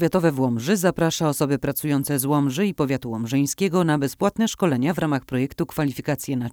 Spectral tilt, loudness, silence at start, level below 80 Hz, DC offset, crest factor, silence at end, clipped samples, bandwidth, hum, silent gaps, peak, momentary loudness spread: -5.5 dB/octave; -22 LUFS; 0 s; -52 dBFS; under 0.1%; 16 dB; 0 s; under 0.1%; over 20 kHz; none; none; -6 dBFS; 5 LU